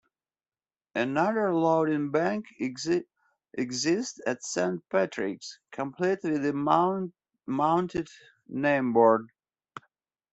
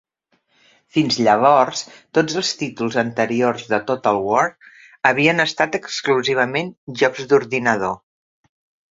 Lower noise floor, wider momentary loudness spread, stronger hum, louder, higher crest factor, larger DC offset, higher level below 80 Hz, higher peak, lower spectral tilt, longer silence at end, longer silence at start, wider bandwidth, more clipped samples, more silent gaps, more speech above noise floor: first, under -90 dBFS vs -66 dBFS; first, 16 LU vs 9 LU; neither; second, -27 LUFS vs -19 LUFS; about the same, 20 dB vs 20 dB; neither; second, -68 dBFS vs -60 dBFS; second, -8 dBFS vs 0 dBFS; about the same, -5 dB/octave vs -4 dB/octave; second, 0.55 s vs 0.95 s; about the same, 0.95 s vs 0.95 s; about the same, 8.2 kHz vs 7.8 kHz; neither; second, none vs 6.77-6.87 s; first, over 63 dB vs 48 dB